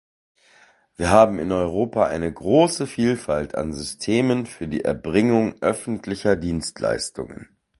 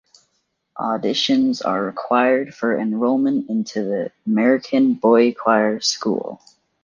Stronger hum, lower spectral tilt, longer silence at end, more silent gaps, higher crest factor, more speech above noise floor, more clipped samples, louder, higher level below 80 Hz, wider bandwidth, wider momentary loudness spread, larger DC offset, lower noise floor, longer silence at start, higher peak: neither; about the same, -5.5 dB/octave vs -4.5 dB/octave; second, 0.35 s vs 0.5 s; neither; about the same, 22 dB vs 18 dB; second, 34 dB vs 52 dB; neither; second, -22 LUFS vs -19 LUFS; first, -44 dBFS vs -66 dBFS; first, 11.5 kHz vs 7.4 kHz; about the same, 10 LU vs 9 LU; neither; second, -56 dBFS vs -70 dBFS; first, 1 s vs 0.75 s; about the same, 0 dBFS vs -2 dBFS